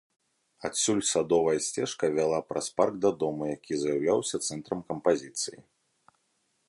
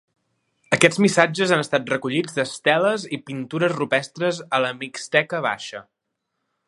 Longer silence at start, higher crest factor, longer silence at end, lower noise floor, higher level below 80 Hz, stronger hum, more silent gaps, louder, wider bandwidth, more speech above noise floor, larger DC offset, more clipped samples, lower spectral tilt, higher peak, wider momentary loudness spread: about the same, 0.6 s vs 0.7 s; about the same, 20 dB vs 22 dB; first, 1.05 s vs 0.85 s; second, -74 dBFS vs -78 dBFS; about the same, -66 dBFS vs -68 dBFS; neither; neither; second, -28 LUFS vs -21 LUFS; about the same, 11.5 kHz vs 11.5 kHz; second, 46 dB vs 57 dB; neither; neither; about the same, -3.5 dB/octave vs -4.5 dB/octave; second, -10 dBFS vs 0 dBFS; second, 9 LU vs 12 LU